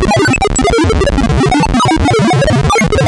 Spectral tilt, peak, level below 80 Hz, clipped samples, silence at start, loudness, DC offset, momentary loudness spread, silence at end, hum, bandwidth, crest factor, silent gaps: -5 dB/octave; -2 dBFS; -20 dBFS; under 0.1%; 0 s; -10 LUFS; under 0.1%; 1 LU; 0 s; none; 11.5 kHz; 8 dB; none